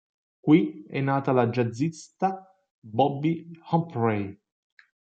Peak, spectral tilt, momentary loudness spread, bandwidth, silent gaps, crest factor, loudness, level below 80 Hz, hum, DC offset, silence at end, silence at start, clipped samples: -6 dBFS; -8 dB/octave; 11 LU; 8.8 kHz; 2.71-2.82 s; 20 dB; -26 LUFS; -72 dBFS; none; under 0.1%; 0.75 s; 0.45 s; under 0.1%